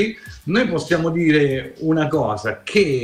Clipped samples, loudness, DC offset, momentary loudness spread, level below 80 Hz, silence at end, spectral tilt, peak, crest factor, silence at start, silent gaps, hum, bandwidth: under 0.1%; -19 LUFS; under 0.1%; 7 LU; -48 dBFS; 0 s; -6 dB/octave; -6 dBFS; 14 dB; 0 s; none; none; 14 kHz